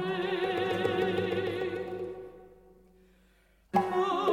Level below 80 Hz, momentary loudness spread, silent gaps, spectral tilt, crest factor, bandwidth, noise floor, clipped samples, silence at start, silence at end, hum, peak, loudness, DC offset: -66 dBFS; 11 LU; none; -6 dB/octave; 20 dB; 16 kHz; -64 dBFS; under 0.1%; 0 s; 0 s; none; -12 dBFS; -31 LUFS; under 0.1%